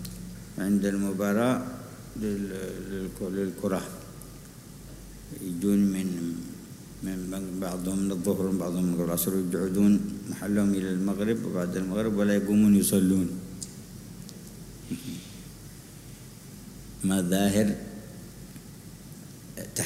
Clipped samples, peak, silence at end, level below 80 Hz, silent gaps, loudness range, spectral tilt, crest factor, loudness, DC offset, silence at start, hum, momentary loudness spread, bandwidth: under 0.1%; -12 dBFS; 0 s; -52 dBFS; none; 9 LU; -6 dB/octave; 16 dB; -28 LUFS; under 0.1%; 0 s; none; 21 LU; 16 kHz